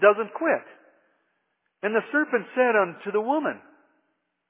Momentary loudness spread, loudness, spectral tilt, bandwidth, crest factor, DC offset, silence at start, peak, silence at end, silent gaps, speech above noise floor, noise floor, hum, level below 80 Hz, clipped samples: 8 LU; -25 LUFS; -8.5 dB/octave; 3.8 kHz; 20 dB; under 0.1%; 0 s; -6 dBFS; 0.9 s; none; 52 dB; -75 dBFS; none; under -90 dBFS; under 0.1%